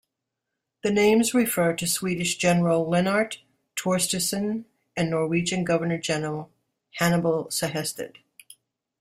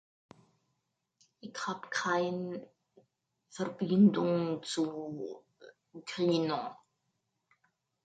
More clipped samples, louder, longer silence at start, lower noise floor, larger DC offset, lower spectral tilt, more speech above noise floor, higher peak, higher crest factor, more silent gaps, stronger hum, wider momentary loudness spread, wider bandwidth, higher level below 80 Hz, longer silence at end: neither; first, -24 LUFS vs -32 LUFS; second, 0.85 s vs 1.45 s; about the same, -83 dBFS vs -82 dBFS; neither; second, -4.5 dB/octave vs -6 dB/octave; first, 59 dB vs 51 dB; first, -6 dBFS vs -14 dBFS; about the same, 20 dB vs 20 dB; neither; neither; second, 13 LU vs 21 LU; first, 16 kHz vs 9.2 kHz; first, -60 dBFS vs -80 dBFS; second, 0.9 s vs 1.3 s